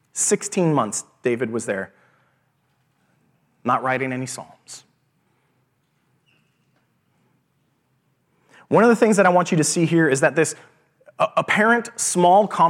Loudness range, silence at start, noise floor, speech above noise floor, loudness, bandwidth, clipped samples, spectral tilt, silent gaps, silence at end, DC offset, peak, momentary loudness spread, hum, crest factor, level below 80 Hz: 10 LU; 0.15 s; -67 dBFS; 48 dB; -19 LUFS; 16.5 kHz; under 0.1%; -4.5 dB/octave; none; 0 s; under 0.1%; -2 dBFS; 16 LU; none; 20 dB; -76 dBFS